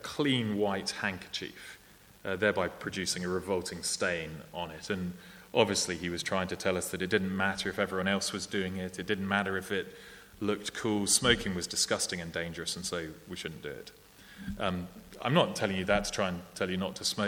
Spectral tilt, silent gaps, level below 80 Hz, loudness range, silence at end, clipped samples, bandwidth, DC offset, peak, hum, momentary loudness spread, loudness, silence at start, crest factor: -3.5 dB/octave; none; -58 dBFS; 4 LU; 0 s; under 0.1%; 19.5 kHz; under 0.1%; -8 dBFS; none; 14 LU; -32 LUFS; 0 s; 24 dB